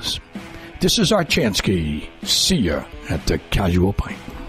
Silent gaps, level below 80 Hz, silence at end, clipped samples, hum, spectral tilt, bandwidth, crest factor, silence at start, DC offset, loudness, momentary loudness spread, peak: none; -32 dBFS; 0 s; under 0.1%; none; -4 dB/octave; 16 kHz; 14 dB; 0 s; under 0.1%; -19 LUFS; 12 LU; -6 dBFS